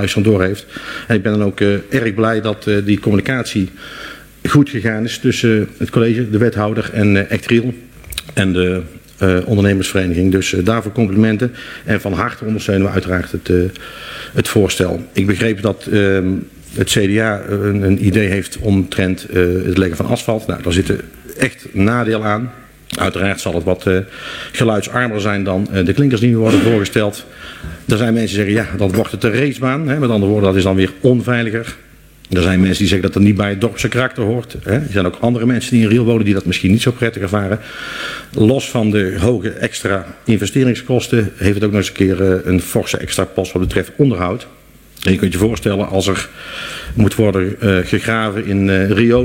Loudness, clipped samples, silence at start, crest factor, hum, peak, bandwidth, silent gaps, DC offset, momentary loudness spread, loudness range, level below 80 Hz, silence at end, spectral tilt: -15 LUFS; under 0.1%; 0 s; 14 dB; none; 0 dBFS; 16.5 kHz; none; under 0.1%; 9 LU; 2 LU; -38 dBFS; 0 s; -6 dB/octave